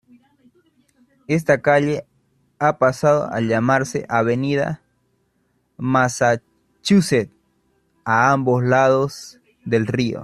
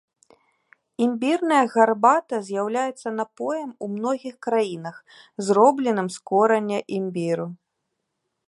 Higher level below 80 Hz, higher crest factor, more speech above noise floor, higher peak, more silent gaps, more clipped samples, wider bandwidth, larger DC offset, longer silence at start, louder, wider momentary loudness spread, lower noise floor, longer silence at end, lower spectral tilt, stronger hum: first, -56 dBFS vs -78 dBFS; about the same, 18 dB vs 20 dB; second, 48 dB vs 56 dB; about the same, -2 dBFS vs -2 dBFS; neither; neither; first, 13 kHz vs 11.5 kHz; neither; first, 1.3 s vs 1 s; first, -19 LUFS vs -22 LUFS; about the same, 12 LU vs 12 LU; second, -66 dBFS vs -78 dBFS; second, 0 s vs 0.95 s; about the same, -6 dB/octave vs -5.5 dB/octave; neither